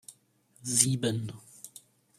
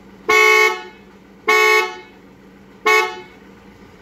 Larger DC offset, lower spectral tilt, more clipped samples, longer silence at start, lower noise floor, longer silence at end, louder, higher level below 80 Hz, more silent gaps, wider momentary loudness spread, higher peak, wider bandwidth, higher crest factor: neither; first, -3.5 dB/octave vs -1 dB/octave; neither; second, 0.1 s vs 0.3 s; first, -65 dBFS vs -44 dBFS; second, 0.5 s vs 0.8 s; second, -27 LUFS vs -14 LUFS; second, -68 dBFS vs -58 dBFS; neither; first, 23 LU vs 15 LU; second, -4 dBFS vs 0 dBFS; about the same, 15.5 kHz vs 16 kHz; first, 30 dB vs 18 dB